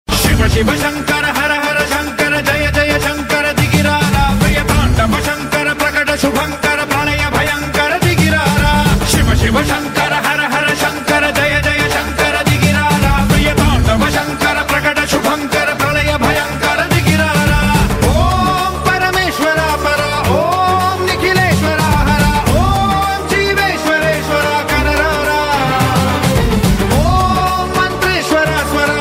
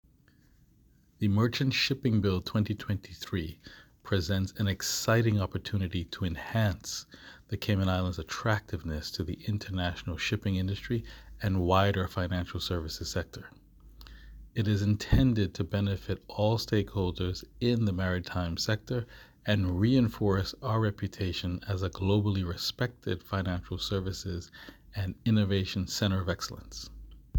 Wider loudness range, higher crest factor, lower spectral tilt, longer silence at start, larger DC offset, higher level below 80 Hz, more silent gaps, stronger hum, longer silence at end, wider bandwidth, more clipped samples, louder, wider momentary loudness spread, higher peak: about the same, 1 LU vs 3 LU; second, 12 dB vs 20 dB; about the same, -4.5 dB/octave vs -5.5 dB/octave; second, 0.1 s vs 1.2 s; neither; first, -22 dBFS vs -46 dBFS; neither; neither; about the same, 0 s vs 0 s; second, 16.5 kHz vs 19.5 kHz; neither; first, -13 LUFS vs -31 LUFS; second, 3 LU vs 11 LU; first, 0 dBFS vs -10 dBFS